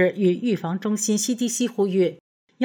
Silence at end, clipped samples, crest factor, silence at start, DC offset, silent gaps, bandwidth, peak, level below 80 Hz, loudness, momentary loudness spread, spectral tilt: 0 s; under 0.1%; 14 dB; 0 s; under 0.1%; 2.20-2.47 s; over 20 kHz; -8 dBFS; -80 dBFS; -23 LUFS; 4 LU; -4.5 dB/octave